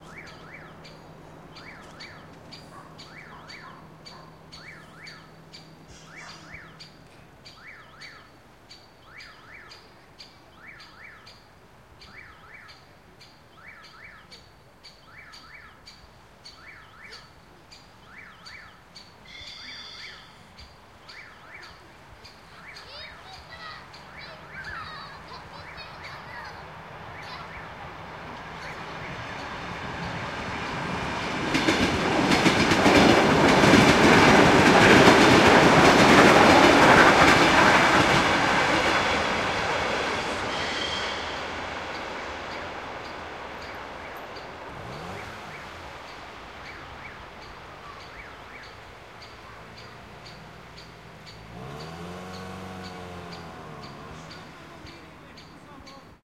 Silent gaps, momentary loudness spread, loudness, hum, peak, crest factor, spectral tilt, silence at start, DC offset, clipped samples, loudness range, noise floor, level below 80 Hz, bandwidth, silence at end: none; 29 LU; -19 LUFS; none; -2 dBFS; 24 dB; -4.5 dB/octave; 0.15 s; under 0.1%; under 0.1%; 28 LU; -53 dBFS; -48 dBFS; 16 kHz; 0.35 s